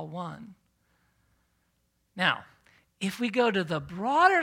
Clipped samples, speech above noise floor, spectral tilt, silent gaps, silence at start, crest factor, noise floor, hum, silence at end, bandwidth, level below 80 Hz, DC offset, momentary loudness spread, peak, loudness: under 0.1%; 47 dB; -5 dB/octave; none; 0 s; 22 dB; -73 dBFS; none; 0 s; 16.5 kHz; -68 dBFS; under 0.1%; 17 LU; -8 dBFS; -28 LUFS